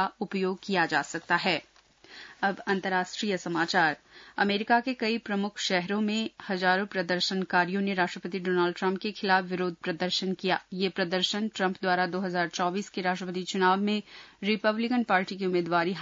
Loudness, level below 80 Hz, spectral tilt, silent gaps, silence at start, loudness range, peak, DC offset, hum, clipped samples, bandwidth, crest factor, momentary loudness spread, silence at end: -28 LUFS; -74 dBFS; -4.5 dB/octave; none; 0 s; 1 LU; -10 dBFS; under 0.1%; none; under 0.1%; 7.8 kHz; 18 dB; 6 LU; 0 s